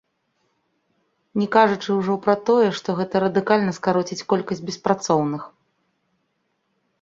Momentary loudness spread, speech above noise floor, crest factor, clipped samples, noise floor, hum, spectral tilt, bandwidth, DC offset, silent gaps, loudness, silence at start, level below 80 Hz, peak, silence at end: 9 LU; 51 dB; 20 dB; under 0.1%; -72 dBFS; none; -5.5 dB/octave; 7.8 kHz; under 0.1%; none; -21 LUFS; 1.35 s; -64 dBFS; -2 dBFS; 1.55 s